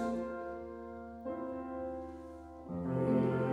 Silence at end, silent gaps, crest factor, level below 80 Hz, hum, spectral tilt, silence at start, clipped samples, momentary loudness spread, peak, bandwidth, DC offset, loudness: 0 s; none; 16 dB; -60 dBFS; none; -9.5 dB/octave; 0 s; under 0.1%; 16 LU; -20 dBFS; 10.5 kHz; under 0.1%; -38 LUFS